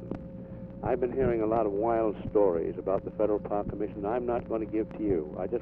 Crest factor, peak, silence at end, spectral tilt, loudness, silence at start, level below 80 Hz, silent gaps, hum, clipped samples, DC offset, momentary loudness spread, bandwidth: 16 dB; -12 dBFS; 0 s; -11.5 dB/octave; -30 LUFS; 0 s; -48 dBFS; none; none; under 0.1%; under 0.1%; 9 LU; 3.7 kHz